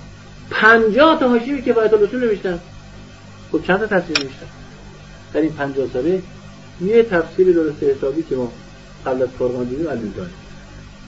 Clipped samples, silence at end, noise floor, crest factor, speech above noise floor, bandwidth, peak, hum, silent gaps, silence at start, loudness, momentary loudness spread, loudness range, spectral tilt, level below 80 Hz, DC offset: under 0.1%; 0 s; -39 dBFS; 18 dB; 22 dB; 8 kHz; 0 dBFS; 50 Hz at -40 dBFS; none; 0 s; -17 LUFS; 16 LU; 7 LU; -3.5 dB/octave; -44 dBFS; 0.3%